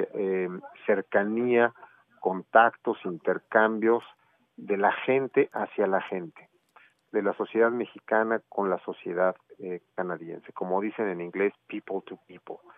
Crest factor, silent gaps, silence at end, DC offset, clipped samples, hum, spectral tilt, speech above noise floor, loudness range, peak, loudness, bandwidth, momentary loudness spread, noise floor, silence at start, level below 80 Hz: 24 dB; none; 0.2 s; under 0.1%; under 0.1%; none; -9 dB/octave; 33 dB; 6 LU; -4 dBFS; -27 LUFS; 3.8 kHz; 14 LU; -60 dBFS; 0 s; under -90 dBFS